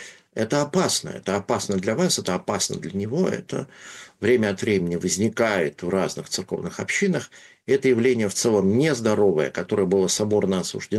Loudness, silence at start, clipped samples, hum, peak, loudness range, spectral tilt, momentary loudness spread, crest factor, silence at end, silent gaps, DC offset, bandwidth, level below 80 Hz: -23 LUFS; 0 s; under 0.1%; none; -8 dBFS; 3 LU; -4.5 dB/octave; 9 LU; 14 dB; 0 s; none; under 0.1%; 12.5 kHz; -60 dBFS